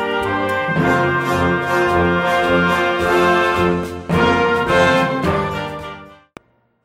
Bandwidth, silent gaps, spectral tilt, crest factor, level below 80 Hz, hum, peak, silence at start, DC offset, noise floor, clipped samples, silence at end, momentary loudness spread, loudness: 16 kHz; none; -6 dB/octave; 14 dB; -40 dBFS; none; -2 dBFS; 0 s; under 0.1%; -45 dBFS; under 0.1%; 0.7 s; 8 LU; -16 LUFS